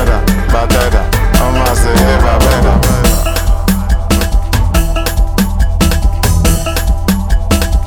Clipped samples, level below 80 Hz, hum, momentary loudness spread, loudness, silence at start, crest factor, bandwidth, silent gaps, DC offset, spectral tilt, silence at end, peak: under 0.1%; -12 dBFS; none; 4 LU; -12 LUFS; 0 s; 10 dB; 19.5 kHz; none; under 0.1%; -5 dB/octave; 0 s; 0 dBFS